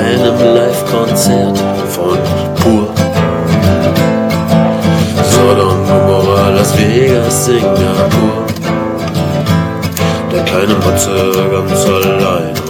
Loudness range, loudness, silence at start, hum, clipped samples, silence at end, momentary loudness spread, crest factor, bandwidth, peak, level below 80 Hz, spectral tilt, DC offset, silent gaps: 3 LU; -11 LUFS; 0 s; none; 0.5%; 0 s; 5 LU; 10 dB; 17.5 kHz; 0 dBFS; -40 dBFS; -5.5 dB/octave; under 0.1%; none